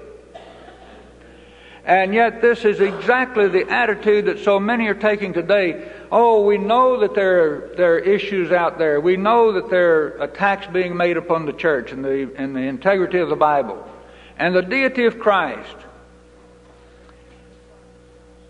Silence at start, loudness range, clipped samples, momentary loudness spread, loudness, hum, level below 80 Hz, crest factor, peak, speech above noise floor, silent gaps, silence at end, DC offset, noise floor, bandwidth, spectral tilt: 0 s; 5 LU; under 0.1%; 8 LU; -18 LUFS; none; -52 dBFS; 18 dB; -2 dBFS; 30 dB; none; 2.6 s; under 0.1%; -47 dBFS; 9 kHz; -6.5 dB/octave